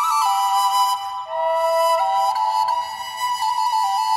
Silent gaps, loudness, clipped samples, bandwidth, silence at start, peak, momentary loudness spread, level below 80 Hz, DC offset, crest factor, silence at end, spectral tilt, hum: none; -20 LUFS; under 0.1%; 16 kHz; 0 s; -8 dBFS; 7 LU; -70 dBFS; under 0.1%; 12 dB; 0 s; 1.5 dB/octave; none